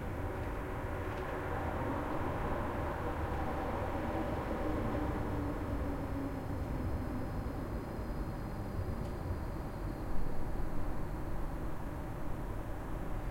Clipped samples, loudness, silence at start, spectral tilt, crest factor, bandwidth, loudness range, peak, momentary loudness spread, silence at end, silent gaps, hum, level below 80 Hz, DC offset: under 0.1%; -39 LUFS; 0 s; -7.5 dB/octave; 16 dB; 16.5 kHz; 4 LU; -20 dBFS; 5 LU; 0 s; none; none; -42 dBFS; under 0.1%